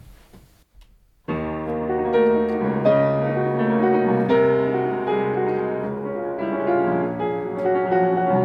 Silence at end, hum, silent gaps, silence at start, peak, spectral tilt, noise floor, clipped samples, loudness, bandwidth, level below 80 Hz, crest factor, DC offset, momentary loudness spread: 0 s; none; none; 0.05 s; -6 dBFS; -9.5 dB/octave; -52 dBFS; under 0.1%; -21 LUFS; 5.6 kHz; -50 dBFS; 16 dB; under 0.1%; 9 LU